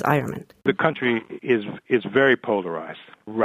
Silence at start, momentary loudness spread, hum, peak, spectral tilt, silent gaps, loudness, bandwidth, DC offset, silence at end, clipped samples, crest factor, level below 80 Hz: 0 s; 14 LU; none; -2 dBFS; -7 dB/octave; none; -23 LUFS; 14.5 kHz; under 0.1%; 0 s; under 0.1%; 20 dB; -64 dBFS